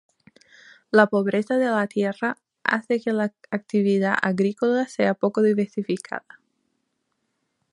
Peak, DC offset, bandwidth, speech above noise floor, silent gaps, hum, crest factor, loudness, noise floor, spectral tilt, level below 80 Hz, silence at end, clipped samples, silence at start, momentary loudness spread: -2 dBFS; under 0.1%; 11 kHz; 53 dB; none; none; 22 dB; -23 LUFS; -75 dBFS; -6.5 dB/octave; -74 dBFS; 1.55 s; under 0.1%; 0.95 s; 9 LU